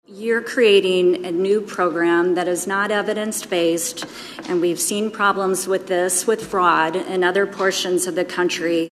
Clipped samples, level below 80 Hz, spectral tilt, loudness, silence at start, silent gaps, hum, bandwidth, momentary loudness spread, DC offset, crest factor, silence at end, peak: under 0.1%; -66 dBFS; -3 dB/octave; -19 LUFS; 0.1 s; none; none; 14.5 kHz; 6 LU; under 0.1%; 18 dB; 0.05 s; -2 dBFS